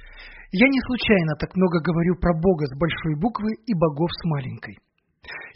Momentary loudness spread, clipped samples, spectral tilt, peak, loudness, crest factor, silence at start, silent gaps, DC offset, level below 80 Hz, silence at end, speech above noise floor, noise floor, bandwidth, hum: 18 LU; under 0.1%; -5.5 dB/octave; -4 dBFS; -22 LUFS; 20 dB; 0 s; none; under 0.1%; -42 dBFS; 0.05 s; 21 dB; -43 dBFS; 5.8 kHz; none